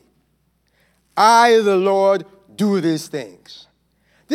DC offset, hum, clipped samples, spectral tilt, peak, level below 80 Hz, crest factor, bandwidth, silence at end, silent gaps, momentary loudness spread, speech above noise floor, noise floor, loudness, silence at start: under 0.1%; none; under 0.1%; -4.5 dB/octave; 0 dBFS; -70 dBFS; 18 dB; 15.5 kHz; 0 s; none; 18 LU; 49 dB; -64 dBFS; -16 LUFS; 1.15 s